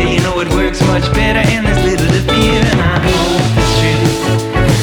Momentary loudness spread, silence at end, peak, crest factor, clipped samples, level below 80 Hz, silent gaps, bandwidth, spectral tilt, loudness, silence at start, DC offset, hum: 3 LU; 0 s; 0 dBFS; 12 dB; under 0.1%; -22 dBFS; none; 19.5 kHz; -5.5 dB/octave; -12 LUFS; 0 s; under 0.1%; none